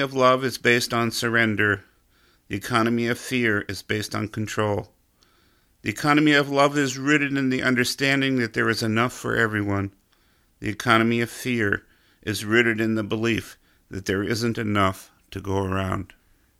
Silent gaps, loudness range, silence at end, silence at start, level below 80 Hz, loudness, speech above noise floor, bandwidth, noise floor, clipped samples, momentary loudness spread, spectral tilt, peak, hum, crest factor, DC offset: none; 5 LU; 0.55 s; 0 s; -56 dBFS; -23 LUFS; 40 dB; 16 kHz; -62 dBFS; under 0.1%; 12 LU; -5 dB/octave; -2 dBFS; none; 22 dB; under 0.1%